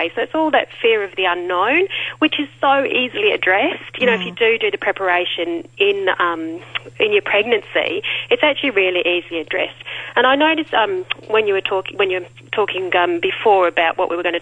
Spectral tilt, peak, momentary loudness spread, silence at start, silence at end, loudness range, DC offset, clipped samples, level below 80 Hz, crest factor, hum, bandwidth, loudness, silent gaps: -5 dB/octave; -2 dBFS; 7 LU; 0 s; 0 s; 1 LU; under 0.1%; under 0.1%; -60 dBFS; 16 dB; none; 9.2 kHz; -17 LUFS; none